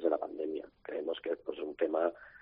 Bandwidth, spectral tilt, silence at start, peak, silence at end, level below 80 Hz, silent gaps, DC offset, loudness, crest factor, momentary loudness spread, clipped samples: 4.9 kHz; -2 dB/octave; 0 s; -16 dBFS; 0 s; -74 dBFS; none; under 0.1%; -36 LUFS; 18 dB; 9 LU; under 0.1%